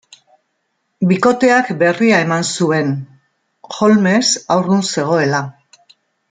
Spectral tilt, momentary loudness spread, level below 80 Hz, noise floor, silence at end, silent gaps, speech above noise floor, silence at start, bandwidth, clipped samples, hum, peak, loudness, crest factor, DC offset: -4.5 dB/octave; 9 LU; -60 dBFS; -69 dBFS; 0.8 s; none; 55 dB; 1 s; 9.6 kHz; under 0.1%; none; -2 dBFS; -14 LUFS; 14 dB; under 0.1%